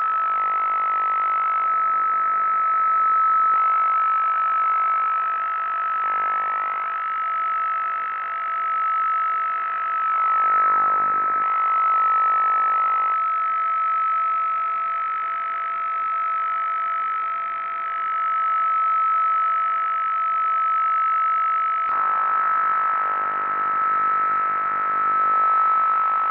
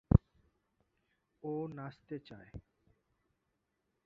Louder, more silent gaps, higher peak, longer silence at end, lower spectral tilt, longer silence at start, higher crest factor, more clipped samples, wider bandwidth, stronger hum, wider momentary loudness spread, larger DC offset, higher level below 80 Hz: first, -20 LUFS vs -38 LUFS; neither; about the same, -10 dBFS vs -8 dBFS; second, 0 s vs 1.45 s; second, -5.5 dB/octave vs -10 dB/octave; about the same, 0 s vs 0.1 s; second, 12 dB vs 30 dB; neither; second, 4.1 kHz vs 5 kHz; neither; second, 6 LU vs 23 LU; neither; second, -70 dBFS vs -46 dBFS